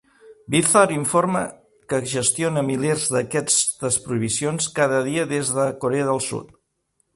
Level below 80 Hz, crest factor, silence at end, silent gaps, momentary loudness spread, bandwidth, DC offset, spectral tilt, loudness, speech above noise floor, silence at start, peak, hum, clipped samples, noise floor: -58 dBFS; 20 dB; 0.7 s; none; 8 LU; 12 kHz; under 0.1%; -3.5 dB/octave; -21 LUFS; 49 dB; 0.25 s; -2 dBFS; none; under 0.1%; -70 dBFS